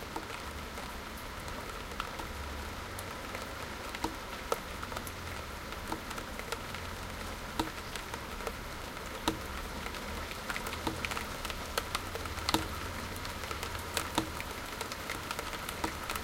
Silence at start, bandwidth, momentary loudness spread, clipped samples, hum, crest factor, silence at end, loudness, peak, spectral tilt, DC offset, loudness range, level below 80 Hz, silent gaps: 0 s; 17 kHz; 6 LU; under 0.1%; none; 30 dB; 0 s; -38 LUFS; -8 dBFS; -3.5 dB/octave; under 0.1%; 4 LU; -48 dBFS; none